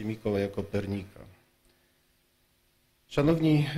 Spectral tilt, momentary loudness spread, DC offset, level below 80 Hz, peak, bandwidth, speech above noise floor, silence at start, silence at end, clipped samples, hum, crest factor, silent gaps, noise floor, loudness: -8 dB/octave; 12 LU; under 0.1%; -54 dBFS; -14 dBFS; 14 kHz; 41 dB; 0 s; 0 s; under 0.1%; none; 16 dB; none; -69 dBFS; -29 LUFS